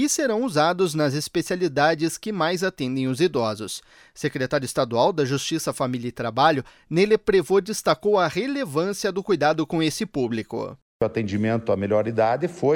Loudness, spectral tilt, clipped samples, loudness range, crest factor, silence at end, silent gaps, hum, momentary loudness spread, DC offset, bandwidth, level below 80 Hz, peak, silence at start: -23 LUFS; -5 dB/octave; under 0.1%; 3 LU; 16 dB; 0 s; 10.82-11.00 s; none; 7 LU; under 0.1%; 18.5 kHz; -56 dBFS; -6 dBFS; 0 s